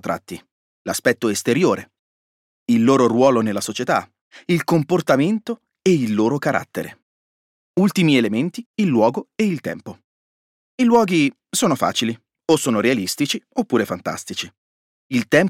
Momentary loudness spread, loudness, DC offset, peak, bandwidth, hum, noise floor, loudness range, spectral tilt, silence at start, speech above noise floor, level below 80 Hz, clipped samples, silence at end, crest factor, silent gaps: 14 LU; -19 LUFS; under 0.1%; -4 dBFS; 16.5 kHz; none; under -90 dBFS; 2 LU; -5 dB/octave; 0.05 s; over 71 dB; -64 dBFS; under 0.1%; 0 s; 16 dB; 0.52-0.85 s, 1.99-2.66 s, 4.21-4.31 s, 7.02-7.74 s, 8.66-8.74 s, 10.04-10.78 s, 14.57-15.10 s